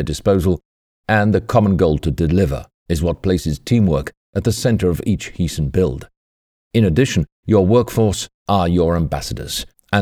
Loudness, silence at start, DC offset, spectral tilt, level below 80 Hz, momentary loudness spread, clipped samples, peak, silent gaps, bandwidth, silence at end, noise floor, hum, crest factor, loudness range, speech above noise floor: -18 LUFS; 0 s; under 0.1%; -6.5 dB/octave; -32 dBFS; 9 LU; under 0.1%; -2 dBFS; 0.65-1.04 s, 2.74-2.86 s, 4.17-4.33 s, 6.17-6.71 s, 7.32-7.43 s, 8.34-8.46 s; 15.5 kHz; 0 s; under -90 dBFS; none; 16 dB; 2 LU; over 74 dB